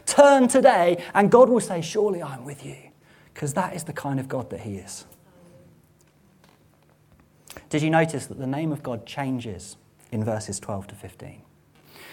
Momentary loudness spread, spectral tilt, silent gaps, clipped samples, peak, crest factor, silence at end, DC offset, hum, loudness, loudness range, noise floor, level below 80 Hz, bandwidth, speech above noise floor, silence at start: 24 LU; -5 dB/octave; none; under 0.1%; -2 dBFS; 22 dB; 0 s; under 0.1%; none; -22 LUFS; 14 LU; -58 dBFS; -62 dBFS; 17 kHz; 36 dB; 0.05 s